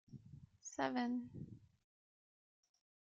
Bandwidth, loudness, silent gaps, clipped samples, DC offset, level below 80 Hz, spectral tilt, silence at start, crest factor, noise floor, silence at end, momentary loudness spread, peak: 7.6 kHz; -43 LUFS; none; under 0.1%; under 0.1%; -78 dBFS; -4.5 dB/octave; 0.1 s; 24 dB; under -90 dBFS; 1.55 s; 21 LU; -24 dBFS